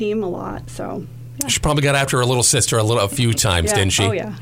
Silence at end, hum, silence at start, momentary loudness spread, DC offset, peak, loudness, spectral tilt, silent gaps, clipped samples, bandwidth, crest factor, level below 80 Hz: 0 s; none; 0 s; 15 LU; under 0.1%; -4 dBFS; -17 LUFS; -3.5 dB/octave; none; under 0.1%; 16.5 kHz; 16 dB; -38 dBFS